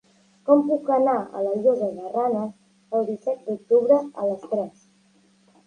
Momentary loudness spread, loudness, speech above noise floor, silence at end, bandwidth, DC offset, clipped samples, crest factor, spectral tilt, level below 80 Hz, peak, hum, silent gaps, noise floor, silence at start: 9 LU; -23 LUFS; 38 dB; 0.95 s; 9.6 kHz; under 0.1%; under 0.1%; 20 dB; -8.5 dB/octave; -74 dBFS; -4 dBFS; none; none; -60 dBFS; 0.45 s